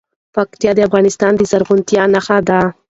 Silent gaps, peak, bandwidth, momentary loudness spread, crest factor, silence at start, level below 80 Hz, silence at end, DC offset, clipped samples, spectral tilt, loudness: none; 0 dBFS; 8 kHz; 6 LU; 12 dB; 0.35 s; -48 dBFS; 0.2 s; under 0.1%; under 0.1%; -5.5 dB/octave; -13 LUFS